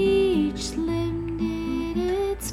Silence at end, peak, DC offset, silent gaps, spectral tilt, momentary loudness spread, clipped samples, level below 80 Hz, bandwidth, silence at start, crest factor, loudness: 0 s; -12 dBFS; under 0.1%; none; -5.5 dB/octave; 7 LU; under 0.1%; -38 dBFS; 15.5 kHz; 0 s; 12 dB; -25 LUFS